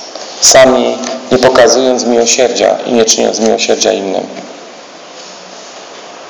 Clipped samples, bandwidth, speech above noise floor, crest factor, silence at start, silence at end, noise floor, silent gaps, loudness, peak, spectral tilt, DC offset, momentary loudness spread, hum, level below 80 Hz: 2%; over 20 kHz; 23 dB; 10 dB; 0 s; 0 s; -31 dBFS; none; -8 LUFS; 0 dBFS; -2 dB/octave; under 0.1%; 23 LU; none; -48 dBFS